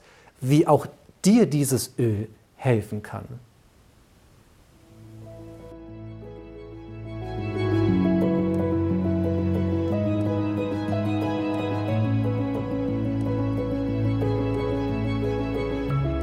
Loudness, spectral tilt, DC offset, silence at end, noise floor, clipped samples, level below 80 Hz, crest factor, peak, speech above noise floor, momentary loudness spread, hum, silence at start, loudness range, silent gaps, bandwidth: -25 LUFS; -7 dB/octave; under 0.1%; 0 s; -56 dBFS; under 0.1%; -44 dBFS; 20 dB; -4 dBFS; 34 dB; 20 LU; none; 0.4 s; 17 LU; none; 15 kHz